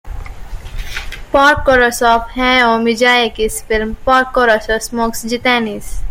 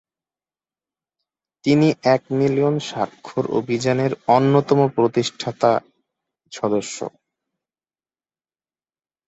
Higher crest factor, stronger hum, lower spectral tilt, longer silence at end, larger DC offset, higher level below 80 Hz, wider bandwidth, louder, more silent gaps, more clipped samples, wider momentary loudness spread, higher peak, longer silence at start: second, 14 dB vs 20 dB; neither; second, -3 dB/octave vs -6 dB/octave; second, 0 s vs 2.2 s; neither; first, -28 dBFS vs -62 dBFS; first, 16.5 kHz vs 8.2 kHz; first, -13 LUFS vs -20 LUFS; neither; neither; first, 17 LU vs 10 LU; about the same, 0 dBFS vs -2 dBFS; second, 0.05 s vs 1.65 s